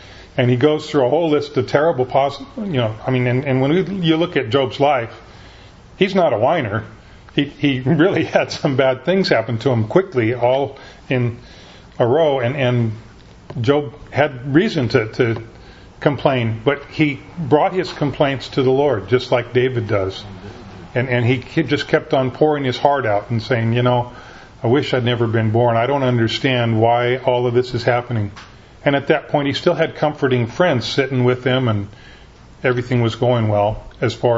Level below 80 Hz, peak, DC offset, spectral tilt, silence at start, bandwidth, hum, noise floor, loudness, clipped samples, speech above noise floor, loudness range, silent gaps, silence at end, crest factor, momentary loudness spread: -46 dBFS; 0 dBFS; under 0.1%; -7 dB/octave; 0 s; 7.8 kHz; none; -42 dBFS; -18 LUFS; under 0.1%; 25 dB; 2 LU; none; 0 s; 18 dB; 7 LU